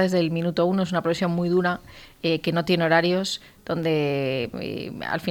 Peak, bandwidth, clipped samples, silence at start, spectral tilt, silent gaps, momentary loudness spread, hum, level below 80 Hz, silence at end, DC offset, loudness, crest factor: -6 dBFS; 19 kHz; under 0.1%; 0 s; -6 dB/octave; none; 11 LU; none; -58 dBFS; 0 s; under 0.1%; -24 LUFS; 18 dB